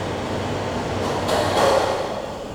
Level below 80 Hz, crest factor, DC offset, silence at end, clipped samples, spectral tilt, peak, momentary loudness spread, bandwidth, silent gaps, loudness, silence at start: -44 dBFS; 16 dB; under 0.1%; 0 s; under 0.1%; -4.5 dB/octave; -6 dBFS; 8 LU; over 20 kHz; none; -22 LUFS; 0 s